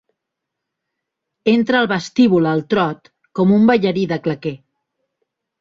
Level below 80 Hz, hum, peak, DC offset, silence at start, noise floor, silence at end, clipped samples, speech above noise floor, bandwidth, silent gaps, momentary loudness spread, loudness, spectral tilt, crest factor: -58 dBFS; none; -2 dBFS; under 0.1%; 1.45 s; -80 dBFS; 1.05 s; under 0.1%; 65 dB; 7.4 kHz; none; 12 LU; -16 LUFS; -7 dB/octave; 18 dB